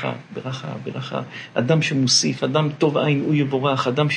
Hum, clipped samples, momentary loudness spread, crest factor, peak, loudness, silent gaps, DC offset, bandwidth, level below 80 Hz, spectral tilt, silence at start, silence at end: none; under 0.1%; 13 LU; 16 dB; -4 dBFS; -21 LUFS; none; under 0.1%; 10.5 kHz; -66 dBFS; -4.5 dB/octave; 0 s; 0 s